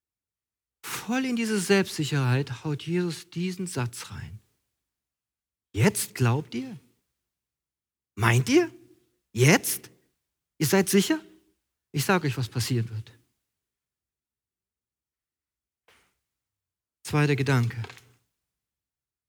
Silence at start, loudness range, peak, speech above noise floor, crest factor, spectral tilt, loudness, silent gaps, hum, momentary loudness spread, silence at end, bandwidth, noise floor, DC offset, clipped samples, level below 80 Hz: 0.85 s; 7 LU; -4 dBFS; over 65 dB; 24 dB; -5 dB/octave; -26 LUFS; none; none; 17 LU; 1.35 s; over 20 kHz; under -90 dBFS; under 0.1%; under 0.1%; -64 dBFS